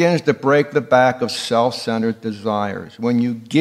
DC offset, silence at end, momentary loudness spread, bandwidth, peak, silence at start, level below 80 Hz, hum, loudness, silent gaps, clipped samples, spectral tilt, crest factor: under 0.1%; 0 s; 8 LU; 14 kHz; 0 dBFS; 0 s; -66 dBFS; none; -18 LUFS; none; under 0.1%; -5.5 dB/octave; 18 dB